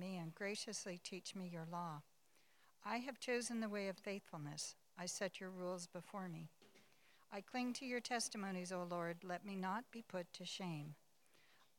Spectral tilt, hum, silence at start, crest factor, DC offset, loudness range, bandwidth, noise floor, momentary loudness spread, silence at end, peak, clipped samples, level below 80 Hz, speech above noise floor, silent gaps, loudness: -4 dB/octave; none; 0 s; 20 dB; under 0.1%; 3 LU; 18 kHz; -76 dBFS; 8 LU; 0.85 s; -28 dBFS; under 0.1%; under -90 dBFS; 30 dB; none; -47 LUFS